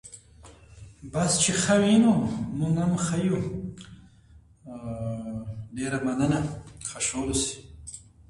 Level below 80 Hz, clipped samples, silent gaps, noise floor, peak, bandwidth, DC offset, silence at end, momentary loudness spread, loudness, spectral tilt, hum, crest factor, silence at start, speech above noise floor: -50 dBFS; under 0.1%; none; -54 dBFS; -8 dBFS; 11.5 kHz; under 0.1%; 0.3 s; 21 LU; -26 LUFS; -4.5 dB/octave; none; 18 dB; 0.05 s; 29 dB